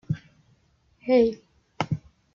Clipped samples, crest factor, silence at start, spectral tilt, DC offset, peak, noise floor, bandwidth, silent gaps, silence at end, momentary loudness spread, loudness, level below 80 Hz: under 0.1%; 18 dB; 0.1 s; -7.5 dB/octave; under 0.1%; -8 dBFS; -64 dBFS; 7.2 kHz; none; 0.35 s; 16 LU; -26 LUFS; -58 dBFS